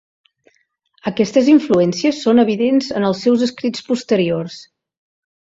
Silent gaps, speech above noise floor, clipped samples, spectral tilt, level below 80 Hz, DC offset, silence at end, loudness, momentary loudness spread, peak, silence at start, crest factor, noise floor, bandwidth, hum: none; 47 dB; under 0.1%; -6 dB/octave; -58 dBFS; under 0.1%; 0.95 s; -16 LUFS; 11 LU; -2 dBFS; 1.05 s; 16 dB; -62 dBFS; 7.8 kHz; none